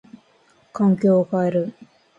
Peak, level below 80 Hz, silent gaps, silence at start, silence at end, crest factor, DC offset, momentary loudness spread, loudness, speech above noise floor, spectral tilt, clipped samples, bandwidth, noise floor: -8 dBFS; -66 dBFS; none; 0.75 s; 0.5 s; 14 dB; under 0.1%; 13 LU; -20 LUFS; 39 dB; -10 dB/octave; under 0.1%; 7.6 kHz; -58 dBFS